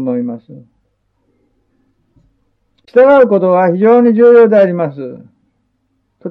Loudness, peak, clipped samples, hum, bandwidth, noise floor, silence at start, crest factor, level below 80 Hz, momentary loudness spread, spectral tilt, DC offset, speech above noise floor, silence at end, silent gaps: -9 LUFS; 0 dBFS; under 0.1%; none; 4.7 kHz; -63 dBFS; 0 s; 12 dB; -60 dBFS; 21 LU; -10 dB/octave; under 0.1%; 54 dB; 0 s; none